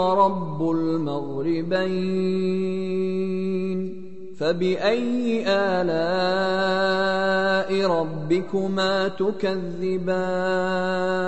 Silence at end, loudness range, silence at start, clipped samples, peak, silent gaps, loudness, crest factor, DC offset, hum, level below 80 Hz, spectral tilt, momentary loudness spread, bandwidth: 0 s; 3 LU; 0 s; under 0.1%; -6 dBFS; none; -23 LUFS; 16 dB; 2%; none; -60 dBFS; -6.5 dB/octave; 5 LU; 8.4 kHz